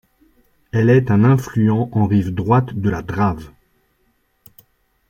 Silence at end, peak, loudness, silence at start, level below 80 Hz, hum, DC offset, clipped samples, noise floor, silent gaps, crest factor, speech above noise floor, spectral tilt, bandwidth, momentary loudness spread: 1.6 s; -2 dBFS; -17 LUFS; 0.75 s; -46 dBFS; none; under 0.1%; under 0.1%; -63 dBFS; none; 16 dB; 48 dB; -9 dB/octave; 16.5 kHz; 8 LU